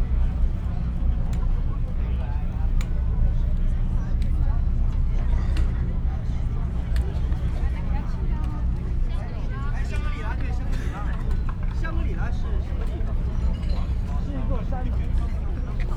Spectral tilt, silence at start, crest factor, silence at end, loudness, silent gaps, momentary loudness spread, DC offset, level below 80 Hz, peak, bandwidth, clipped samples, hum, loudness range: -8 dB/octave; 0 s; 12 dB; 0 s; -28 LUFS; none; 4 LU; under 0.1%; -24 dBFS; -10 dBFS; 5.2 kHz; under 0.1%; none; 3 LU